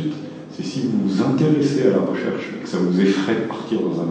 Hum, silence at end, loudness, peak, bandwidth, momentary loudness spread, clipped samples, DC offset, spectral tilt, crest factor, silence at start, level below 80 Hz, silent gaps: none; 0 s; -20 LUFS; -4 dBFS; 9.2 kHz; 10 LU; under 0.1%; under 0.1%; -7 dB/octave; 16 dB; 0 s; -68 dBFS; none